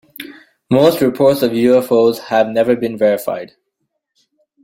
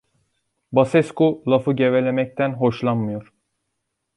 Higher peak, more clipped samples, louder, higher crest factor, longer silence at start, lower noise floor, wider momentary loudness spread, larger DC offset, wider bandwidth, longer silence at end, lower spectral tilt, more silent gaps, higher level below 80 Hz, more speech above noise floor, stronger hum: about the same, 0 dBFS vs -2 dBFS; neither; first, -14 LUFS vs -20 LUFS; about the same, 16 dB vs 18 dB; second, 0.2 s vs 0.7 s; second, -72 dBFS vs -77 dBFS; first, 14 LU vs 6 LU; neither; first, 16.5 kHz vs 11 kHz; first, 1.15 s vs 0.95 s; second, -6 dB/octave vs -8 dB/octave; neither; about the same, -54 dBFS vs -58 dBFS; about the same, 59 dB vs 58 dB; neither